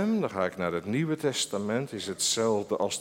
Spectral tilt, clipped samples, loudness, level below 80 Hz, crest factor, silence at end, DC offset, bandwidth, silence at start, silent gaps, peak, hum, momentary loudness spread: -4 dB/octave; under 0.1%; -29 LUFS; -68 dBFS; 16 dB; 0 s; under 0.1%; 16.5 kHz; 0 s; none; -14 dBFS; none; 5 LU